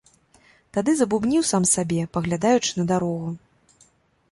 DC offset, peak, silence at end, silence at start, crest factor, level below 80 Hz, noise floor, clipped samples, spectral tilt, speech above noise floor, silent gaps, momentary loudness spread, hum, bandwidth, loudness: under 0.1%; -6 dBFS; 0.95 s; 0.75 s; 18 dB; -56 dBFS; -60 dBFS; under 0.1%; -4.5 dB/octave; 39 dB; none; 10 LU; none; 11.5 kHz; -22 LUFS